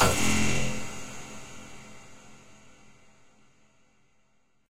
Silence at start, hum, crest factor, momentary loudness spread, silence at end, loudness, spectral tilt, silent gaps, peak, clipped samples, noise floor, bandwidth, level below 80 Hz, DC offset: 0 s; none; 22 dB; 27 LU; 0 s; -29 LUFS; -3.5 dB/octave; none; -10 dBFS; under 0.1%; -71 dBFS; 16 kHz; -48 dBFS; under 0.1%